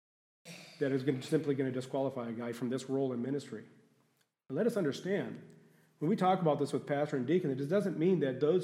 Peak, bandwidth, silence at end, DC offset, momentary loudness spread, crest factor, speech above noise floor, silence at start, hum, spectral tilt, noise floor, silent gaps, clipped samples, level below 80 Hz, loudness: -16 dBFS; 14.5 kHz; 0 s; under 0.1%; 11 LU; 18 dB; 42 dB; 0.45 s; none; -7 dB/octave; -75 dBFS; none; under 0.1%; -84 dBFS; -34 LUFS